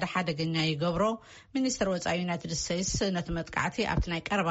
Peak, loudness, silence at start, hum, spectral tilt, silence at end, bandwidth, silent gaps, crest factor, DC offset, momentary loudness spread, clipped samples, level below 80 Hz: -14 dBFS; -30 LUFS; 0 s; none; -4 dB/octave; 0 s; 8 kHz; none; 16 dB; under 0.1%; 4 LU; under 0.1%; -44 dBFS